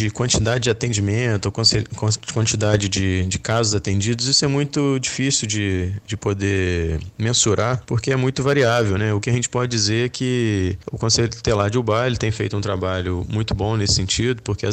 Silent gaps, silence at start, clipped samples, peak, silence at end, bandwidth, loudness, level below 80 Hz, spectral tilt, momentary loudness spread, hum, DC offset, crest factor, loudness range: none; 0 s; under 0.1%; -4 dBFS; 0 s; 9.4 kHz; -20 LUFS; -40 dBFS; -4 dB/octave; 7 LU; none; under 0.1%; 16 dB; 2 LU